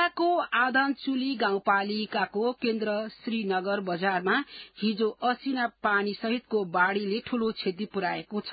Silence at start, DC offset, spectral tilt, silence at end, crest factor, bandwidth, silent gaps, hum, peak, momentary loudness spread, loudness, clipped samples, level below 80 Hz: 0 s; under 0.1%; -9 dB/octave; 0 s; 18 dB; 5 kHz; none; none; -10 dBFS; 6 LU; -28 LUFS; under 0.1%; -70 dBFS